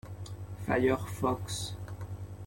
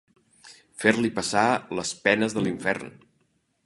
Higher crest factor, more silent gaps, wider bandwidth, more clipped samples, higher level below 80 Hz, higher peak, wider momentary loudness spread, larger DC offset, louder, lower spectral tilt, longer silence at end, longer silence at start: about the same, 20 dB vs 24 dB; neither; first, 16.5 kHz vs 11.5 kHz; neither; first, -52 dBFS vs -62 dBFS; second, -14 dBFS vs -2 dBFS; first, 15 LU vs 9 LU; neither; second, -33 LUFS vs -24 LUFS; first, -5.5 dB/octave vs -4 dB/octave; second, 0 s vs 0.75 s; second, 0.05 s vs 0.45 s